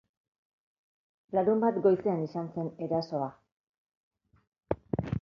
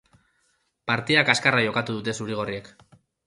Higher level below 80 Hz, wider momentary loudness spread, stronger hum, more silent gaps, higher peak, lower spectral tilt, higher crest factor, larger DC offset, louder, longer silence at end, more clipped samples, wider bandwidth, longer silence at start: about the same, -58 dBFS vs -62 dBFS; about the same, 11 LU vs 13 LU; neither; first, 3.52-3.87 s, 3.95-4.11 s, 4.47-4.52 s vs none; second, -10 dBFS vs -2 dBFS; first, -9.5 dB/octave vs -4 dB/octave; about the same, 22 dB vs 24 dB; neither; second, -30 LUFS vs -23 LUFS; second, 0 s vs 0.6 s; neither; second, 6.6 kHz vs 11.5 kHz; first, 1.3 s vs 0.85 s